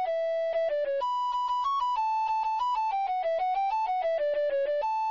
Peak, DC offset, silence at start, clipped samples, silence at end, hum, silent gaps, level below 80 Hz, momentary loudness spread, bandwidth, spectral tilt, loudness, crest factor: -22 dBFS; under 0.1%; 0 s; under 0.1%; 0 s; none; none; -64 dBFS; 1 LU; 7.4 kHz; -1.5 dB/octave; -28 LUFS; 6 dB